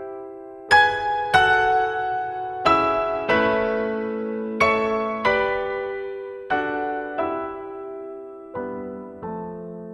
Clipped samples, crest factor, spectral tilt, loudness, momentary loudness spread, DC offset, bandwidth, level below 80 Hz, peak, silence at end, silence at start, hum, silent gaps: under 0.1%; 20 dB; -4.5 dB/octave; -22 LUFS; 17 LU; under 0.1%; 12.5 kHz; -52 dBFS; -2 dBFS; 0 s; 0 s; none; none